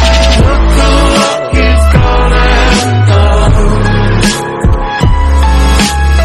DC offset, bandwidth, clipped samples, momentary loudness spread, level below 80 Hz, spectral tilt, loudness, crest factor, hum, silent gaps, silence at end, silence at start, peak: under 0.1%; 12.5 kHz; 2%; 4 LU; -10 dBFS; -5 dB/octave; -9 LUFS; 6 dB; none; none; 0 s; 0 s; 0 dBFS